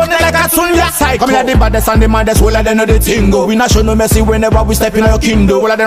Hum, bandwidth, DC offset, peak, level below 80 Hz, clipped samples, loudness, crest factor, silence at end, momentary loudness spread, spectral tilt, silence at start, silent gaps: none; 15.5 kHz; 0.3%; 0 dBFS; -16 dBFS; under 0.1%; -10 LUFS; 10 dB; 0 s; 1 LU; -5 dB/octave; 0 s; none